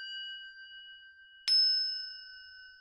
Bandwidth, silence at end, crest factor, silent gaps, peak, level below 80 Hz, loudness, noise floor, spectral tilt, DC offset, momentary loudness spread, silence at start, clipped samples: 16 kHz; 0.05 s; 22 dB; none; -14 dBFS; -78 dBFS; -28 LUFS; -56 dBFS; 4.5 dB/octave; under 0.1%; 25 LU; 0 s; under 0.1%